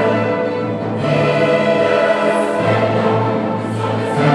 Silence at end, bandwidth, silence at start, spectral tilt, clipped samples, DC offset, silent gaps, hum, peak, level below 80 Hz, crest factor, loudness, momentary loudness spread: 0 s; 11.5 kHz; 0 s; -7 dB/octave; under 0.1%; under 0.1%; none; none; 0 dBFS; -54 dBFS; 14 dB; -16 LUFS; 6 LU